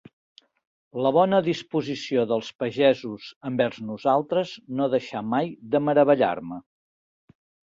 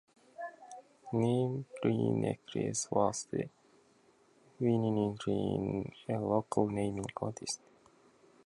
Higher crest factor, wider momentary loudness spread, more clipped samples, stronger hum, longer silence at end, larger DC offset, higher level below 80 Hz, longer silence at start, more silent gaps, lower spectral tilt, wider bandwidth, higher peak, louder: about the same, 18 dB vs 20 dB; second, 11 LU vs 14 LU; neither; neither; first, 1.15 s vs 0.9 s; neither; about the same, -68 dBFS vs -64 dBFS; first, 0.95 s vs 0.4 s; first, 2.55-2.59 s, 3.36-3.41 s vs none; about the same, -6.5 dB/octave vs -6 dB/octave; second, 7.6 kHz vs 11.5 kHz; first, -6 dBFS vs -14 dBFS; first, -24 LUFS vs -34 LUFS